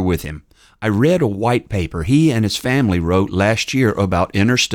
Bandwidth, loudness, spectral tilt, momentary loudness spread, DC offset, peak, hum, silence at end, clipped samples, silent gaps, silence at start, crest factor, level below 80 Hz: 19 kHz; -17 LUFS; -5.5 dB/octave; 8 LU; under 0.1%; -2 dBFS; none; 0 s; under 0.1%; none; 0 s; 14 dB; -38 dBFS